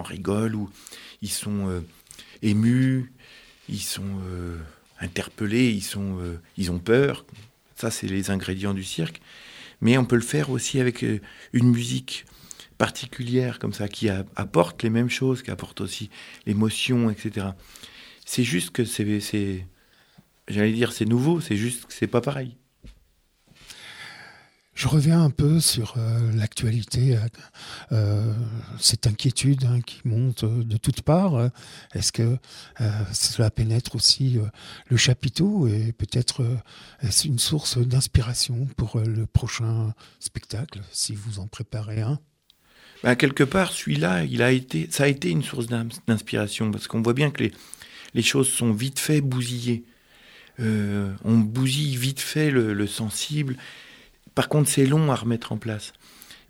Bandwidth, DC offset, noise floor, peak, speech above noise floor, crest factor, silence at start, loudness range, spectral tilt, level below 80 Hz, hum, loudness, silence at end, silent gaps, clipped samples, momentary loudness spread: 17 kHz; under 0.1%; -63 dBFS; -2 dBFS; 39 dB; 22 dB; 0 s; 5 LU; -5 dB/octave; -48 dBFS; none; -24 LUFS; 0.15 s; none; under 0.1%; 15 LU